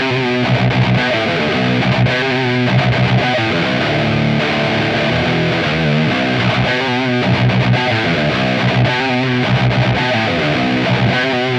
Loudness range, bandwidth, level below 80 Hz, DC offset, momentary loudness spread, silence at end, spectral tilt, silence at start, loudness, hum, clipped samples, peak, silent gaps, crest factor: 1 LU; 8.6 kHz; -38 dBFS; under 0.1%; 1 LU; 0 s; -6.5 dB/octave; 0 s; -14 LUFS; none; under 0.1%; -2 dBFS; none; 12 dB